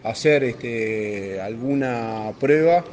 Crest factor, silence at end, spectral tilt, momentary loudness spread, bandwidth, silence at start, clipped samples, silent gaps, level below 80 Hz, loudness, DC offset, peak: 18 dB; 0 s; -6 dB/octave; 11 LU; 9.4 kHz; 0.05 s; under 0.1%; none; -60 dBFS; -22 LUFS; under 0.1%; -4 dBFS